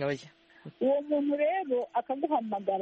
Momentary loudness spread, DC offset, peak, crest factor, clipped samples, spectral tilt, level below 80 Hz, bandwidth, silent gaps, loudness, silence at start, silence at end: 5 LU; under 0.1%; -16 dBFS; 14 dB; under 0.1%; -7 dB/octave; -76 dBFS; 8.2 kHz; none; -30 LUFS; 0 s; 0 s